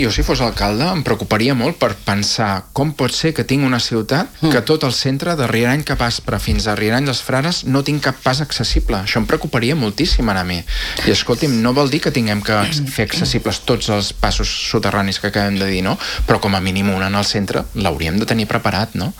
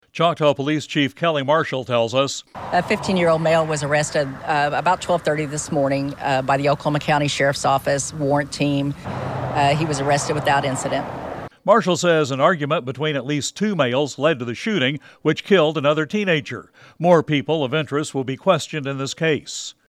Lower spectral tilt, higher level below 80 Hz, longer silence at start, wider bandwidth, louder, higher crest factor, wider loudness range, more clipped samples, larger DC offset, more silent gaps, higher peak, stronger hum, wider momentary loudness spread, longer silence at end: about the same, -5 dB/octave vs -5 dB/octave; first, -28 dBFS vs -54 dBFS; second, 0 s vs 0.15 s; first, 18 kHz vs 14.5 kHz; first, -17 LUFS vs -20 LUFS; about the same, 16 dB vs 18 dB; about the same, 1 LU vs 1 LU; neither; neither; neither; about the same, 0 dBFS vs -2 dBFS; neither; second, 4 LU vs 7 LU; second, 0 s vs 0.15 s